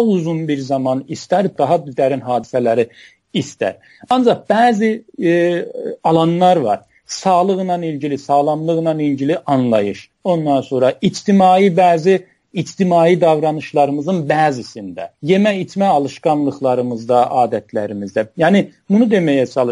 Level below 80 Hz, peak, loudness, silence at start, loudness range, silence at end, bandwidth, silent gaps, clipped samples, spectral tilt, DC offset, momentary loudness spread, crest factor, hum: -62 dBFS; -2 dBFS; -16 LUFS; 0 s; 3 LU; 0 s; 11.5 kHz; none; under 0.1%; -6.5 dB/octave; under 0.1%; 10 LU; 14 dB; none